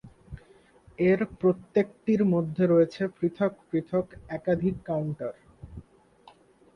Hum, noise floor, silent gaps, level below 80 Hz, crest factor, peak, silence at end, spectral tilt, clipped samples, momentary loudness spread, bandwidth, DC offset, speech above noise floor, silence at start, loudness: none; -57 dBFS; none; -56 dBFS; 16 dB; -10 dBFS; 0.95 s; -9.5 dB/octave; under 0.1%; 23 LU; 6.4 kHz; under 0.1%; 31 dB; 0.05 s; -27 LUFS